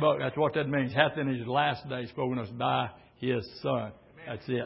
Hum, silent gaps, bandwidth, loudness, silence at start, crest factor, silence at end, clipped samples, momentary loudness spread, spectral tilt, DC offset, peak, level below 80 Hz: none; none; 5.8 kHz; -30 LUFS; 0 s; 24 dB; 0 s; under 0.1%; 11 LU; -10 dB/octave; under 0.1%; -6 dBFS; -62 dBFS